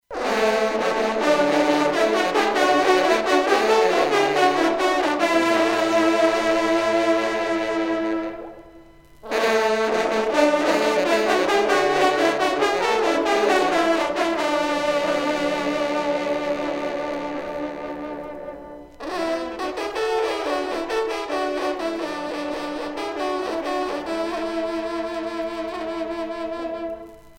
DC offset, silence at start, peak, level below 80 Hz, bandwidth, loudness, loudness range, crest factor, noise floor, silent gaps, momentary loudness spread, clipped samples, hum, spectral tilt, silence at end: under 0.1%; 0.1 s; -4 dBFS; -54 dBFS; 16.5 kHz; -21 LUFS; 8 LU; 16 dB; -47 dBFS; none; 10 LU; under 0.1%; none; -3.5 dB/octave; 0.05 s